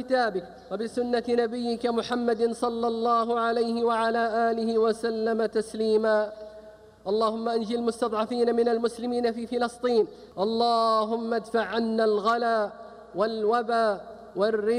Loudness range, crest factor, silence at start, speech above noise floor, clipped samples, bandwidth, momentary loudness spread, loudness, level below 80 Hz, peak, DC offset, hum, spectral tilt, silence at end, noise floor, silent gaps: 2 LU; 14 dB; 0 s; 23 dB; under 0.1%; 11 kHz; 7 LU; -26 LUFS; -64 dBFS; -10 dBFS; under 0.1%; none; -5 dB/octave; 0 s; -48 dBFS; none